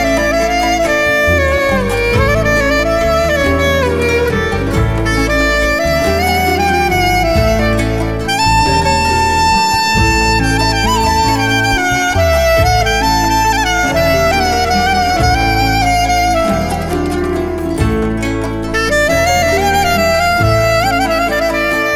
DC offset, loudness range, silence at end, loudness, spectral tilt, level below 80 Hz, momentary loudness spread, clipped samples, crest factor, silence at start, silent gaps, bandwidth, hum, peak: 0.8%; 2 LU; 0 s; -12 LUFS; -4.5 dB/octave; -22 dBFS; 4 LU; under 0.1%; 12 dB; 0 s; none; 18 kHz; none; 0 dBFS